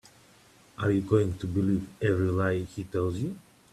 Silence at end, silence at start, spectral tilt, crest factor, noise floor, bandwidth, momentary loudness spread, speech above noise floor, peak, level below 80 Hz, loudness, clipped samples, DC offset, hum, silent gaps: 0.35 s; 0.8 s; -8 dB/octave; 18 dB; -58 dBFS; 13 kHz; 9 LU; 30 dB; -10 dBFS; -56 dBFS; -28 LUFS; under 0.1%; under 0.1%; none; none